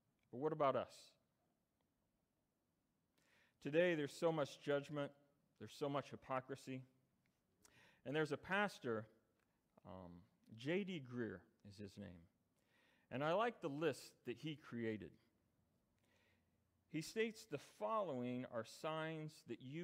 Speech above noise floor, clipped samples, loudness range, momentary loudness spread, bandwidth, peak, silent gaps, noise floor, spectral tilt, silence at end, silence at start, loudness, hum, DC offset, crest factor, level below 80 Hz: 43 dB; under 0.1%; 7 LU; 18 LU; 15.5 kHz; -26 dBFS; none; -87 dBFS; -5.5 dB/octave; 0 s; 0.35 s; -45 LUFS; none; under 0.1%; 22 dB; -86 dBFS